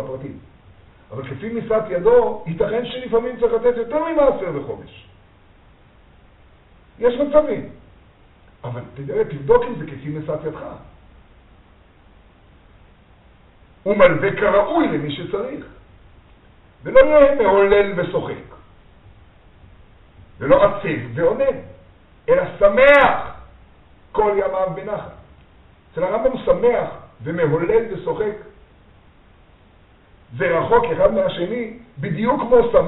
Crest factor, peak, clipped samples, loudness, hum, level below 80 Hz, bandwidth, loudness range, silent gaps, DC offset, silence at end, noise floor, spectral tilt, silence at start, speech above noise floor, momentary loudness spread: 20 dB; 0 dBFS; under 0.1%; -18 LUFS; none; -42 dBFS; 4.1 kHz; 7 LU; none; under 0.1%; 0 s; -50 dBFS; -4.5 dB/octave; 0 s; 33 dB; 18 LU